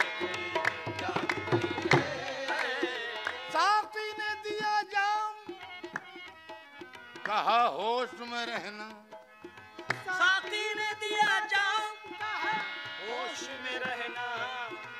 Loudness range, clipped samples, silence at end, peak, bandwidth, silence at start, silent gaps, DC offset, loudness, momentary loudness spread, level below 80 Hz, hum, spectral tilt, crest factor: 4 LU; under 0.1%; 0 s; -10 dBFS; 15 kHz; 0 s; none; under 0.1%; -31 LUFS; 19 LU; -76 dBFS; none; -3.5 dB/octave; 24 dB